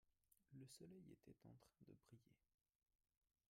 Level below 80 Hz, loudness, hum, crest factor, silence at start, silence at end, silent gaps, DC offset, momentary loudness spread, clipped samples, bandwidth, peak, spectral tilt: -90 dBFS; -66 LUFS; none; 18 dB; 0.05 s; 1.1 s; none; under 0.1%; 6 LU; under 0.1%; 14 kHz; -52 dBFS; -5.5 dB/octave